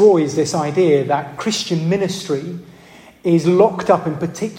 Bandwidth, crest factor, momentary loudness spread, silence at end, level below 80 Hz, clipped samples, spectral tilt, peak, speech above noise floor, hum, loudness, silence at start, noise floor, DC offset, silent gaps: 16 kHz; 16 dB; 10 LU; 0 s; -58 dBFS; under 0.1%; -6 dB/octave; -2 dBFS; 26 dB; none; -17 LUFS; 0 s; -43 dBFS; under 0.1%; none